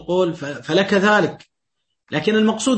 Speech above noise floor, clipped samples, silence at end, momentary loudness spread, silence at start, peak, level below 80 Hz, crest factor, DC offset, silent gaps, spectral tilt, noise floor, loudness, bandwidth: 60 dB; under 0.1%; 0 s; 10 LU; 0 s; -2 dBFS; -60 dBFS; 18 dB; under 0.1%; none; -4.5 dB/octave; -78 dBFS; -19 LUFS; 8.8 kHz